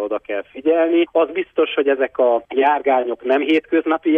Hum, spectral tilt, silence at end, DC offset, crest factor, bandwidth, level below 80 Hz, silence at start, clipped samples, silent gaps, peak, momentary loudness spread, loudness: none; -6 dB/octave; 0 s; under 0.1%; 12 dB; 3.8 kHz; -64 dBFS; 0 s; under 0.1%; none; -6 dBFS; 5 LU; -18 LUFS